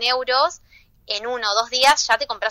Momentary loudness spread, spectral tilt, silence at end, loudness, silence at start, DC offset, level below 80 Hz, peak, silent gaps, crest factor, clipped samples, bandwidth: 10 LU; 1 dB/octave; 0 s; -19 LUFS; 0 s; under 0.1%; -56 dBFS; -4 dBFS; none; 16 dB; under 0.1%; 16 kHz